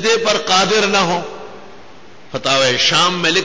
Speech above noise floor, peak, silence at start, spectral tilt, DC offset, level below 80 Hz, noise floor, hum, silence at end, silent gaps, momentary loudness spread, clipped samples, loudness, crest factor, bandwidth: 27 dB; -2 dBFS; 0 s; -2.5 dB/octave; 1%; -54 dBFS; -42 dBFS; none; 0 s; none; 14 LU; under 0.1%; -14 LUFS; 14 dB; 8 kHz